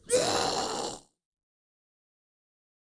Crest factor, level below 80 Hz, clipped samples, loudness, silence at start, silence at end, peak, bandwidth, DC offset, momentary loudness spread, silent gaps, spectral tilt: 22 dB; -62 dBFS; under 0.1%; -29 LUFS; 0.05 s; 1.8 s; -12 dBFS; 10.5 kHz; under 0.1%; 13 LU; none; -2 dB/octave